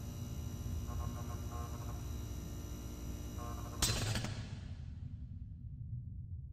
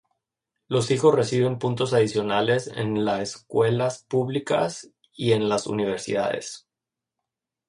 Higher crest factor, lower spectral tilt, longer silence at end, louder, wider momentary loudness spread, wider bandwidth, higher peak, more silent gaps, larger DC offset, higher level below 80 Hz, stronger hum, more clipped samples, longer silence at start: first, 24 dB vs 18 dB; second, -4 dB/octave vs -5.5 dB/octave; second, 0 s vs 1.1 s; second, -43 LUFS vs -24 LUFS; first, 12 LU vs 9 LU; first, 15.5 kHz vs 11 kHz; second, -18 dBFS vs -6 dBFS; neither; neither; first, -48 dBFS vs -62 dBFS; neither; neither; second, 0 s vs 0.7 s